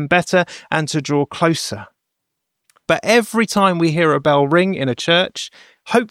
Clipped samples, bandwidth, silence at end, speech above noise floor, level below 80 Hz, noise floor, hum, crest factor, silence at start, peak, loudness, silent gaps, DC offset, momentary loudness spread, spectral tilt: under 0.1%; 16 kHz; 0.05 s; 60 dB; -58 dBFS; -77 dBFS; none; 16 dB; 0 s; -2 dBFS; -17 LUFS; none; under 0.1%; 9 LU; -5 dB/octave